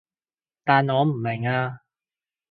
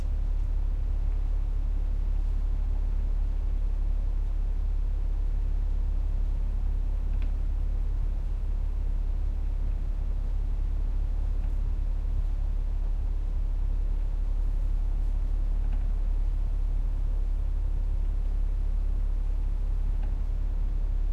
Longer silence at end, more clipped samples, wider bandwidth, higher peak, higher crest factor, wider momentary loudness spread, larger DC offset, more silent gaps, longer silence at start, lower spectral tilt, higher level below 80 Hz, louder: first, 0.75 s vs 0 s; neither; first, 4.8 kHz vs 2.7 kHz; first, -4 dBFS vs -18 dBFS; first, 22 dB vs 8 dB; first, 10 LU vs 1 LU; neither; neither; first, 0.65 s vs 0 s; first, -10.5 dB/octave vs -8.5 dB/octave; second, -66 dBFS vs -26 dBFS; first, -23 LUFS vs -33 LUFS